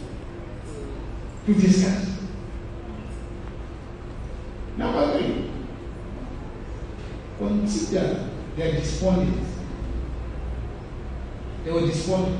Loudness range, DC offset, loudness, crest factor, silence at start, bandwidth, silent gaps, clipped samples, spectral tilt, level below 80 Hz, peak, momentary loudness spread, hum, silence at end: 4 LU; under 0.1%; -27 LUFS; 20 dB; 0 s; 10 kHz; none; under 0.1%; -6.5 dB/octave; -36 dBFS; -6 dBFS; 15 LU; none; 0 s